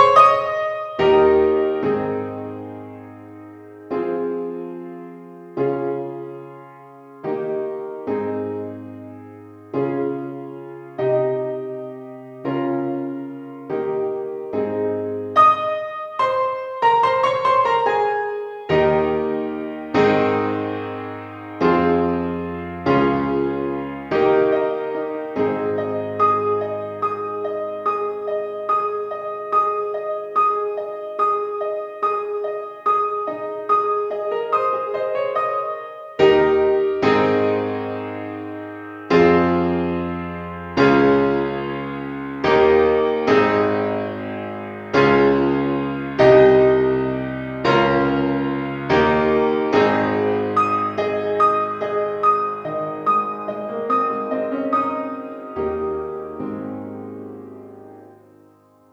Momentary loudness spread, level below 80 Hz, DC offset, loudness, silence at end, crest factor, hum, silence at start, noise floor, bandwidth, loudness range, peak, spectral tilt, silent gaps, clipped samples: 16 LU; -50 dBFS; under 0.1%; -20 LUFS; 0.8 s; 20 dB; none; 0 s; -52 dBFS; 7.2 kHz; 10 LU; 0 dBFS; -7.5 dB/octave; none; under 0.1%